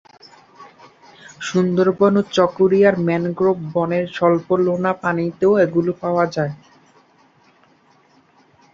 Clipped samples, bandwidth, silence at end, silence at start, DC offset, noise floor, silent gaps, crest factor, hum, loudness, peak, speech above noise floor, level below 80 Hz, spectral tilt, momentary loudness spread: under 0.1%; 7.6 kHz; 2.2 s; 0.6 s; under 0.1%; -55 dBFS; none; 18 dB; none; -18 LUFS; -2 dBFS; 38 dB; -60 dBFS; -7 dB/octave; 6 LU